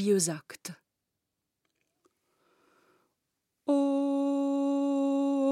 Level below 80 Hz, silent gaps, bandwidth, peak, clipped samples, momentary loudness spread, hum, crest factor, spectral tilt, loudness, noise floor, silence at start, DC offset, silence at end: -90 dBFS; none; 14 kHz; -16 dBFS; under 0.1%; 15 LU; none; 16 dB; -5 dB/octave; -29 LUFS; -85 dBFS; 0 s; under 0.1%; 0 s